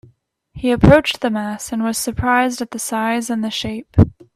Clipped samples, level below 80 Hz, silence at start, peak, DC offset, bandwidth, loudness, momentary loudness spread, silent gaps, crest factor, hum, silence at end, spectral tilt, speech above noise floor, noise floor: under 0.1%; -34 dBFS; 0.55 s; 0 dBFS; under 0.1%; 15.5 kHz; -18 LUFS; 12 LU; none; 18 dB; none; 0.25 s; -5.5 dB/octave; 38 dB; -54 dBFS